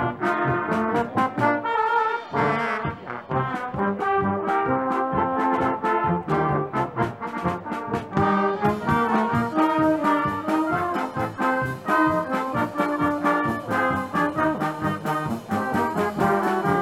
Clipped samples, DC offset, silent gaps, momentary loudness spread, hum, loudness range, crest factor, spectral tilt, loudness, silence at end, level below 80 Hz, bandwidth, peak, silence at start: under 0.1%; under 0.1%; none; 6 LU; none; 2 LU; 16 dB; -7 dB/octave; -23 LUFS; 0 s; -54 dBFS; 15.5 kHz; -8 dBFS; 0 s